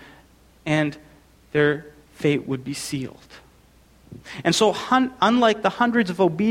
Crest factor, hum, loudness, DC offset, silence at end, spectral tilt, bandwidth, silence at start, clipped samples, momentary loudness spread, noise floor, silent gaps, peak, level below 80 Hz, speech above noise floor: 18 dB; none; -22 LUFS; under 0.1%; 0 s; -5 dB/octave; 16.5 kHz; 0.65 s; under 0.1%; 12 LU; -54 dBFS; none; -4 dBFS; -56 dBFS; 33 dB